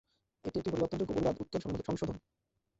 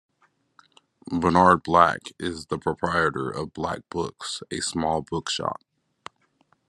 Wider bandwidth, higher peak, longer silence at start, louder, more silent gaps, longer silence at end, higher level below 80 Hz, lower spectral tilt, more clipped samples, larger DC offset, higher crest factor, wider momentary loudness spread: second, 8 kHz vs 12 kHz; second, -18 dBFS vs -2 dBFS; second, 0.45 s vs 1.05 s; second, -36 LUFS vs -24 LUFS; neither; second, 0.6 s vs 1.15 s; about the same, -56 dBFS vs -58 dBFS; first, -7 dB/octave vs -4.5 dB/octave; neither; neither; second, 18 dB vs 24 dB; second, 7 LU vs 15 LU